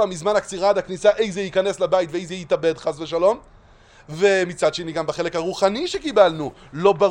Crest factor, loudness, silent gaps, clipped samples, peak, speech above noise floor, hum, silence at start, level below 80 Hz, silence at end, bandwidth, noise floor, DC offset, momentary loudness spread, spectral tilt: 20 dB; -21 LUFS; none; under 0.1%; -2 dBFS; 29 dB; none; 0 s; -52 dBFS; 0 s; 10.5 kHz; -49 dBFS; under 0.1%; 9 LU; -4.5 dB/octave